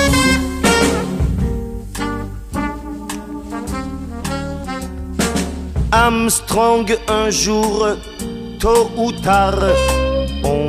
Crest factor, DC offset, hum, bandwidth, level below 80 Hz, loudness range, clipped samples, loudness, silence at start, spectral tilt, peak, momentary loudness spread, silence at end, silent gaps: 16 dB; under 0.1%; none; 15.5 kHz; -26 dBFS; 9 LU; under 0.1%; -17 LUFS; 0 s; -4.5 dB/octave; -2 dBFS; 13 LU; 0 s; none